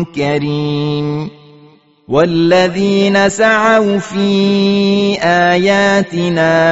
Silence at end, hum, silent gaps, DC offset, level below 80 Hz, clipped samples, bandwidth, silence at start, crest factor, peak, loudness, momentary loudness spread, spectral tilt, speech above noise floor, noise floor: 0 s; none; none; 0.2%; -48 dBFS; under 0.1%; 8 kHz; 0 s; 12 dB; 0 dBFS; -12 LUFS; 6 LU; -4.5 dB/octave; 33 dB; -45 dBFS